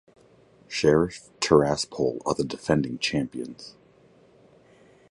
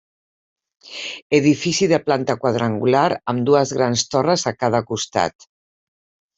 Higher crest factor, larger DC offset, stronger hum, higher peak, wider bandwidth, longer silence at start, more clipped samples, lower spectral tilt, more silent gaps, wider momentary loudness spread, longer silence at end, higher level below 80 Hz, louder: first, 24 dB vs 18 dB; neither; neither; about the same, -4 dBFS vs -2 dBFS; first, 11.5 kHz vs 8.2 kHz; second, 0.7 s vs 0.85 s; neither; about the same, -5 dB/octave vs -4.5 dB/octave; second, none vs 1.22-1.30 s; first, 15 LU vs 7 LU; first, 1.4 s vs 1.05 s; first, -52 dBFS vs -60 dBFS; second, -25 LUFS vs -19 LUFS